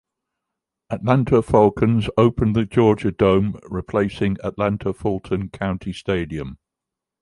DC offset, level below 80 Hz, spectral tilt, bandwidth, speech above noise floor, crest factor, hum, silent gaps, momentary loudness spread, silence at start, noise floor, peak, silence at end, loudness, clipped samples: under 0.1%; -42 dBFS; -8.5 dB/octave; 11.5 kHz; 66 dB; 18 dB; none; none; 10 LU; 0.9 s; -85 dBFS; -2 dBFS; 0.65 s; -20 LUFS; under 0.1%